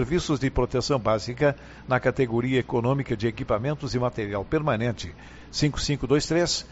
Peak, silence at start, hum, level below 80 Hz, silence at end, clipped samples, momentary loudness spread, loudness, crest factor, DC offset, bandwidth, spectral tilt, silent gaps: -8 dBFS; 0 s; none; -42 dBFS; 0.05 s; under 0.1%; 6 LU; -25 LUFS; 18 dB; under 0.1%; 8 kHz; -5 dB/octave; none